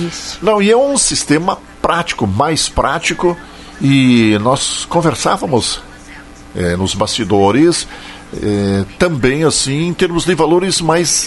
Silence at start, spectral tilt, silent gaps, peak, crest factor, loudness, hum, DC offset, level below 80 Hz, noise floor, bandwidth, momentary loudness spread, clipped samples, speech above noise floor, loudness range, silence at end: 0 s; -4 dB/octave; none; 0 dBFS; 14 dB; -13 LUFS; none; under 0.1%; -36 dBFS; -34 dBFS; 12 kHz; 9 LU; under 0.1%; 21 dB; 2 LU; 0 s